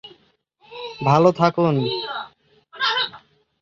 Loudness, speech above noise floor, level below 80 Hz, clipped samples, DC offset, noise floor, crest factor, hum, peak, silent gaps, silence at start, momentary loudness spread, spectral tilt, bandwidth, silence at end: -20 LUFS; 44 dB; -62 dBFS; under 0.1%; under 0.1%; -61 dBFS; 20 dB; none; -2 dBFS; none; 0.05 s; 19 LU; -6.5 dB/octave; 7.4 kHz; 0.45 s